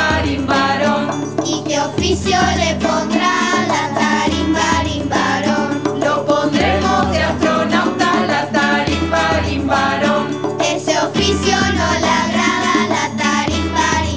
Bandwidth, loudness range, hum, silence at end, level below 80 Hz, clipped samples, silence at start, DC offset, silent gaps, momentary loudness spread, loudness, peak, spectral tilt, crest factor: 8 kHz; 1 LU; none; 0 s; -32 dBFS; under 0.1%; 0 s; 0.4%; none; 3 LU; -16 LUFS; 0 dBFS; -4 dB/octave; 14 dB